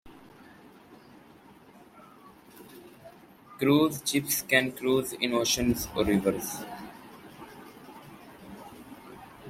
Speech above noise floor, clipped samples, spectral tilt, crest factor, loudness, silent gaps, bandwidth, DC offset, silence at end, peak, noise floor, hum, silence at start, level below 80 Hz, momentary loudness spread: 27 dB; under 0.1%; -3.5 dB/octave; 24 dB; -27 LUFS; none; 16 kHz; under 0.1%; 0 s; -6 dBFS; -54 dBFS; none; 0.05 s; -54 dBFS; 24 LU